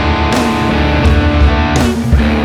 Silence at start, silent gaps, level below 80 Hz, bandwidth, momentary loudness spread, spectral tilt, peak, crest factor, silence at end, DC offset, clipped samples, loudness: 0 s; none; -14 dBFS; 13.5 kHz; 2 LU; -6 dB/octave; 0 dBFS; 10 dB; 0 s; under 0.1%; under 0.1%; -12 LUFS